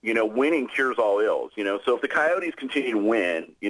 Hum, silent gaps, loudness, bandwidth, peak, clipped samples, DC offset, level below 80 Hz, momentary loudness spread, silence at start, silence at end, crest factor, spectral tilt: none; none; -24 LUFS; 11 kHz; -10 dBFS; under 0.1%; under 0.1%; -70 dBFS; 5 LU; 0 s; 0 s; 14 dB; -4.5 dB/octave